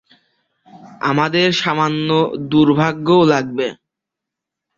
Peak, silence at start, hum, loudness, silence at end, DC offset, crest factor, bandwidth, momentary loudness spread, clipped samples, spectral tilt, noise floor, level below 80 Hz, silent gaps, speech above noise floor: -2 dBFS; 0.75 s; none; -16 LUFS; 1.05 s; under 0.1%; 16 dB; 7.6 kHz; 9 LU; under 0.1%; -6 dB/octave; -83 dBFS; -56 dBFS; none; 68 dB